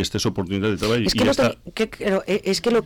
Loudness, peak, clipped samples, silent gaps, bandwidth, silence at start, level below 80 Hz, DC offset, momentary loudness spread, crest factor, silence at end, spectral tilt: -21 LUFS; -12 dBFS; under 0.1%; none; 18.5 kHz; 0 s; -42 dBFS; under 0.1%; 5 LU; 8 dB; 0 s; -5 dB/octave